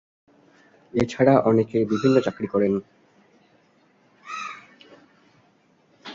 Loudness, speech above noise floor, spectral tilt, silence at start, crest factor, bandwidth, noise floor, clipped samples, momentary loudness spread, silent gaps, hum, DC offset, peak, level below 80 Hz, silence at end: -22 LUFS; 41 dB; -7.5 dB/octave; 0.95 s; 22 dB; 7.6 kHz; -61 dBFS; under 0.1%; 18 LU; none; none; under 0.1%; -4 dBFS; -58 dBFS; 0 s